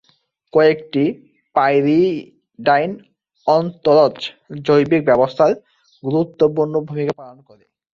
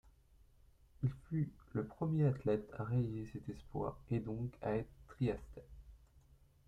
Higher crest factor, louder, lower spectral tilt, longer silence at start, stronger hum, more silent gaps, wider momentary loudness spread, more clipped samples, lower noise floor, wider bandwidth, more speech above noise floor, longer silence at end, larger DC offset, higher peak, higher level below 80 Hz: about the same, 16 dB vs 18 dB; first, -17 LUFS vs -40 LUFS; second, -7.5 dB/octave vs -10 dB/octave; second, 0.55 s vs 1 s; neither; neither; about the same, 13 LU vs 13 LU; neither; second, -61 dBFS vs -67 dBFS; about the same, 7.2 kHz vs 7.4 kHz; first, 45 dB vs 28 dB; about the same, 0.6 s vs 0.5 s; neither; first, -2 dBFS vs -22 dBFS; about the same, -58 dBFS vs -60 dBFS